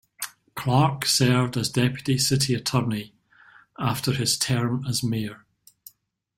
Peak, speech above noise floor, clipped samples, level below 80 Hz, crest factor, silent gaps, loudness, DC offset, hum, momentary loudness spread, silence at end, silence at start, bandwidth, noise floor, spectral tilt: -6 dBFS; 35 dB; under 0.1%; -56 dBFS; 18 dB; none; -23 LUFS; under 0.1%; none; 12 LU; 1 s; 0.2 s; 16.5 kHz; -59 dBFS; -4.5 dB/octave